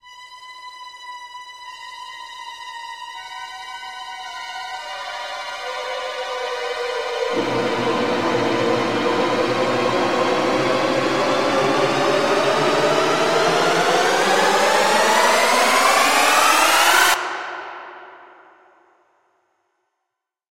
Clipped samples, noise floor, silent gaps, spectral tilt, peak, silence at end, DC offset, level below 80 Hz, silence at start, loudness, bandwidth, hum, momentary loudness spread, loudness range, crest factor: under 0.1%; -80 dBFS; none; -2.5 dB/octave; -2 dBFS; 2.2 s; under 0.1%; -60 dBFS; 0.05 s; -18 LUFS; 16 kHz; none; 20 LU; 18 LU; 18 dB